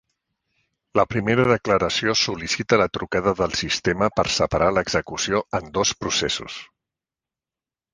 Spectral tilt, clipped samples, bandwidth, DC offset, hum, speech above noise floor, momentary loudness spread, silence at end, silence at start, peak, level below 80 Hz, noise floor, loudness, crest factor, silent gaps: -3.5 dB/octave; under 0.1%; 10.5 kHz; under 0.1%; none; over 68 dB; 6 LU; 1.3 s; 0.95 s; -2 dBFS; -46 dBFS; under -90 dBFS; -21 LUFS; 20 dB; none